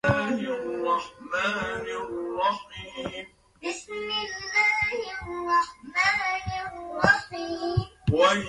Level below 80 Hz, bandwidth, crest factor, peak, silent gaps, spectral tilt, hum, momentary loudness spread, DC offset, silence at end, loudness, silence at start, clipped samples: -48 dBFS; 11.5 kHz; 22 dB; -4 dBFS; none; -4.5 dB/octave; none; 13 LU; under 0.1%; 0 s; -27 LUFS; 0.05 s; under 0.1%